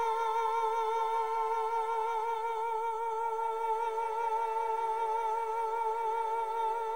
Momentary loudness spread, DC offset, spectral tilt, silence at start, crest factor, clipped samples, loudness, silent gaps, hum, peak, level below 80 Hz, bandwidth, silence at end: 3 LU; 0.3%; -1.5 dB/octave; 0 s; 10 dB; under 0.1%; -32 LUFS; none; none; -22 dBFS; -74 dBFS; 16.5 kHz; 0 s